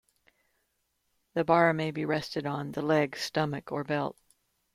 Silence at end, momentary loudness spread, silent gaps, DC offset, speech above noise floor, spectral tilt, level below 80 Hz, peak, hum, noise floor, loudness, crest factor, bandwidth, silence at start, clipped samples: 0.6 s; 10 LU; none; under 0.1%; 48 dB; -6 dB/octave; -68 dBFS; -10 dBFS; none; -77 dBFS; -29 LUFS; 22 dB; 15 kHz; 1.35 s; under 0.1%